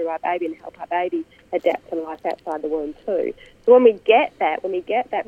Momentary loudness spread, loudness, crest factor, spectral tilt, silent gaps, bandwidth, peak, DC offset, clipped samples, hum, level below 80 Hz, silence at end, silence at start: 14 LU; -21 LUFS; 18 dB; -6 dB/octave; none; 5 kHz; -2 dBFS; under 0.1%; under 0.1%; none; -60 dBFS; 0.05 s; 0 s